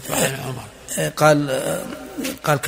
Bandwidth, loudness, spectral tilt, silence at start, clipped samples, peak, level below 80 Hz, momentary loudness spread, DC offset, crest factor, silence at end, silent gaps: 16 kHz; -21 LUFS; -4 dB/octave; 0 s; under 0.1%; 0 dBFS; -52 dBFS; 15 LU; under 0.1%; 20 dB; 0 s; none